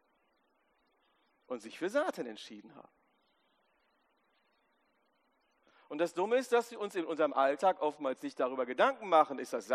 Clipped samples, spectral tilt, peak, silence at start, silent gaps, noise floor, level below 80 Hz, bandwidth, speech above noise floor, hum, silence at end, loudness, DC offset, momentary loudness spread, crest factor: under 0.1%; -4 dB/octave; -12 dBFS; 1.5 s; none; -75 dBFS; under -90 dBFS; 13.5 kHz; 43 dB; none; 0 s; -33 LUFS; under 0.1%; 16 LU; 24 dB